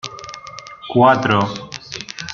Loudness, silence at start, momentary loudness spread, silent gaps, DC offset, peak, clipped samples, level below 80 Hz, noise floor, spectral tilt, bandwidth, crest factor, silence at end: -16 LUFS; 0.05 s; 20 LU; none; under 0.1%; -2 dBFS; under 0.1%; -56 dBFS; -36 dBFS; -5.5 dB/octave; 7.4 kHz; 18 dB; 0 s